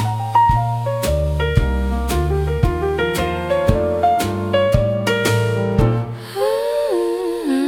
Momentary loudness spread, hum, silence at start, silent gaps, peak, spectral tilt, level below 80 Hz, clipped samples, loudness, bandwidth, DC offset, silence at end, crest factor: 5 LU; none; 0 s; none; 0 dBFS; -6.5 dB/octave; -26 dBFS; under 0.1%; -18 LUFS; 18 kHz; under 0.1%; 0 s; 18 dB